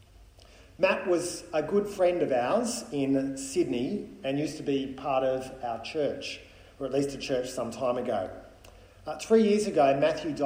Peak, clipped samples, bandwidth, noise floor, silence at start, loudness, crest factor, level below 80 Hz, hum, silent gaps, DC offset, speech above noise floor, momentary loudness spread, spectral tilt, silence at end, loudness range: -12 dBFS; under 0.1%; 16 kHz; -54 dBFS; 0.2 s; -28 LUFS; 18 dB; -58 dBFS; none; none; under 0.1%; 26 dB; 12 LU; -5 dB/octave; 0 s; 5 LU